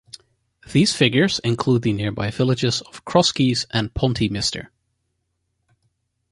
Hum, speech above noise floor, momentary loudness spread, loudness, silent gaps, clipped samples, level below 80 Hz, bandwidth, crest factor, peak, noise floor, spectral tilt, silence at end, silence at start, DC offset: none; 53 dB; 7 LU; -20 LUFS; none; under 0.1%; -46 dBFS; 11.5 kHz; 20 dB; -2 dBFS; -73 dBFS; -5 dB/octave; 1.65 s; 0.7 s; under 0.1%